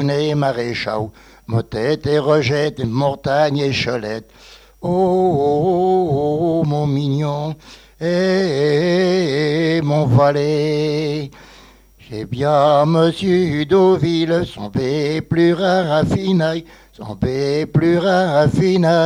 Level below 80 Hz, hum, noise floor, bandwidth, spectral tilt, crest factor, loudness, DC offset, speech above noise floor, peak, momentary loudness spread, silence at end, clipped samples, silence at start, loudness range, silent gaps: -46 dBFS; none; -45 dBFS; 11.5 kHz; -7 dB/octave; 14 dB; -17 LUFS; under 0.1%; 29 dB; -2 dBFS; 10 LU; 0 s; under 0.1%; 0 s; 2 LU; none